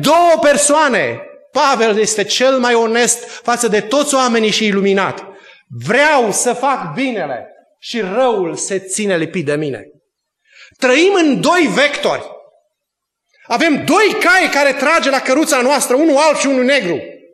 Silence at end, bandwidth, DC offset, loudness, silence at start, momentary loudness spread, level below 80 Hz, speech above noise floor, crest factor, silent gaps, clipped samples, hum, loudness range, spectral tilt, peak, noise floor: 0.15 s; 13 kHz; under 0.1%; -13 LUFS; 0 s; 11 LU; -58 dBFS; 64 dB; 14 dB; none; under 0.1%; none; 6 LU; -3 dB/octave; 0 dBFS; -77 dBFS